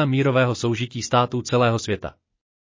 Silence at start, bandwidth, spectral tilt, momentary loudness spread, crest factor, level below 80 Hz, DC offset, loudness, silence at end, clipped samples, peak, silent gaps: 0 s; 7.6 kHz; -5.5 dB/octave; 9 LU; 16 dB; -52 dBFS; under 0.1%; -22 LUFS; 0.6 s; under 0.1%; -4 dBFS; none